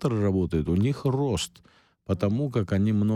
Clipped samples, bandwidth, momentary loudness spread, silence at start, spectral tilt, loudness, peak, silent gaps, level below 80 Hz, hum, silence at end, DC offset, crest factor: under 0.1%; 13.5 kHz; 7 LU; 0 s; -7 dB/octave; -26 LUFS; -12 dBFS; none; -46 dBFS; none; 0 s; under 0.1%; 14 dB